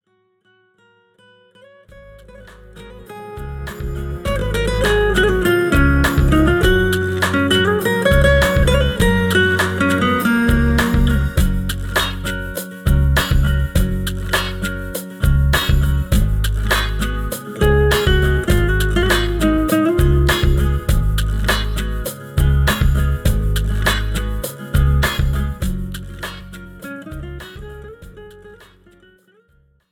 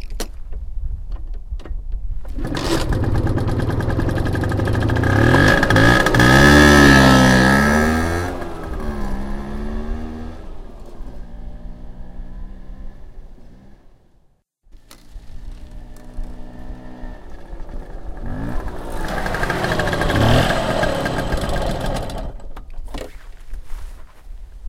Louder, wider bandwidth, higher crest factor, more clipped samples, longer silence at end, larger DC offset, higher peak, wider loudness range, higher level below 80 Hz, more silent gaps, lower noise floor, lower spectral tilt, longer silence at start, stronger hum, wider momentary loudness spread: about the same, -17 LUFS vs -16 LUFS; first, over 20 kHz vs 16.5 kHz; about the same, 16 dB vs 18 dB; neither; first, 1.35 s vs 0 s; neither; about the same, -2 dBFS vs 0 dBFS; second, 13 LU vs 22 LU; first, -20 dBFS vs -26 dBFS; neither; first, -61 dBFS vs -57 dBFS; about the same, -5.5 dB/octave vs -5.5 dB/octave; first, 1.95 s vs 0 s; neither; second, 15 LU vs 27 LU